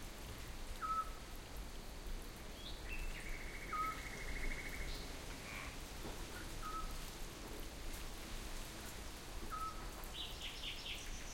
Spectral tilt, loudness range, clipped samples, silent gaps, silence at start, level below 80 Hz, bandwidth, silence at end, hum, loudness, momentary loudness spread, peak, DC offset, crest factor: -3 dB/octave; 3 LU; under 0.1%; none; 0 s; -50 dBFS; 16.5 kHz; 0 s; none; -47 LUFS; 9 LU; -30 dBFS; under 0.1%; 16 dB